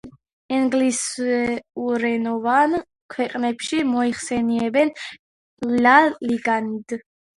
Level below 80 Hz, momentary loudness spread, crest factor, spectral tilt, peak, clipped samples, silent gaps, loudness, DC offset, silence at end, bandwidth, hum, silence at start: -60 dBFS; 13 LU; 20 dB; -3.5 dB/octave; 0 dBFS; under 0.1%; 0.33-0.49 s, 3.01-3.09 s, 5.19-5.57 s; -21 LUFS; under 0.1%; 0.35 s; 11.5 kHz; none; 0.05 s